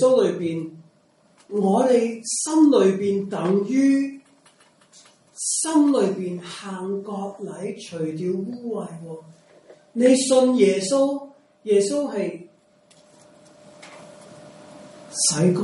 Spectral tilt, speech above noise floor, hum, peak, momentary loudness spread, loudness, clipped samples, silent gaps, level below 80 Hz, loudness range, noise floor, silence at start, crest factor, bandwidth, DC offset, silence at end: -5 dB/octave; 38 dB; none; -6 dBFS; 16 LU; -21 LUFS; under 0.1%; none; -72 dBFS; 10 LU; -59 dBFS; 0 s; 18 dB; 11.5 kHz; under 0.1%; 0 s